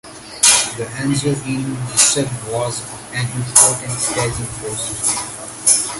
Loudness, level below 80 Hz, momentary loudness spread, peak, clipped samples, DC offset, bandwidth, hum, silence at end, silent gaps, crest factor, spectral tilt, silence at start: -16 LUFS; -46 dBFS; 13 LU; 0 dBFS; under 0.1%; under 0.1%; 16 kHz; none; 0 s; none; 18 dB; -2.5 dB/octave; 0.05 s